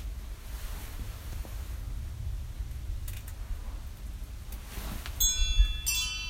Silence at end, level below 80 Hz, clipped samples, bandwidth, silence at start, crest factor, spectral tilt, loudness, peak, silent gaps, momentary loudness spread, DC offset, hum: 0 s; -34 dBFS; under 0.1%; 16 kHz; 0 s; 22 dB; -1.5 dB/octave; -34 LUFS; -12 dBFS; none; 16 LU; under 0.1%; none